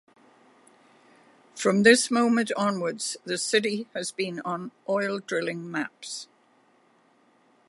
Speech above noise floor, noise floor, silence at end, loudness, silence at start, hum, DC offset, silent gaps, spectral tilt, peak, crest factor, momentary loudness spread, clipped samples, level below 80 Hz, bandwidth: 37 dB; -63 dBFS; 1.45 s; -26 LUFS; 1.55 s; none; under 0.1%; none; -3.5 dB/octave; -4 dBFS; 24 dB; 15 LU; under 0.1%; -74 dBFS; 11.5 kHz